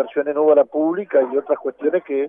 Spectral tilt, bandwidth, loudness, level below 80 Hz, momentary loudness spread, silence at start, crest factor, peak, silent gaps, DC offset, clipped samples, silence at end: -10 dB/octave; 3.6 kHz; -19 LUFS; -74 dBFS; 6 LU; 0 s; 14 dB; -4 dBFS; none; under 0.1%; under 0.1%; 0 s